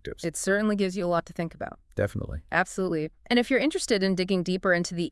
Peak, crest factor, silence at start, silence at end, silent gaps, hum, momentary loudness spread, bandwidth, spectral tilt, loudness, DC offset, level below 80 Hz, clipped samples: -8 dBFS; 18 dB; 0.05 s; 0 s; none; none; 9 LU; 12 kHz; -5 dB/octave; -27 LUFS; under 0.1%; -50 dBFS; under 0.1%